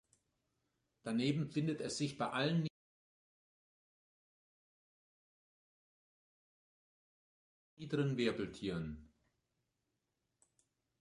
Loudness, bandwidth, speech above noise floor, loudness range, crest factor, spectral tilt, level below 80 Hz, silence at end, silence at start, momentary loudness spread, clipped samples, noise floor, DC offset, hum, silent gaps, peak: -39 LUFS; 11 kHz; 50 dB; 5 LU; 22 dB; -6 dB/octave; -70 dBFS; 1.95 s; 1.05 s; 11 LU; under 0.1%; -87 dBFS; under 0.1%; none; 2.70-7.77 s; -22 dBFS